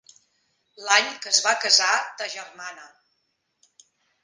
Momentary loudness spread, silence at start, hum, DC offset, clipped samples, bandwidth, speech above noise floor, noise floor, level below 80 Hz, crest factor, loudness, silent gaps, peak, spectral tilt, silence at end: 20 LU; 0.8 s; none; under 0.1%; under 0.1%; 10.5 kHz; 51 dB; -74 dBFS; -84 dBFS; 24 dB; -20 LUFS; none; -2 dBFS; 3 dB/octave; 1.35 s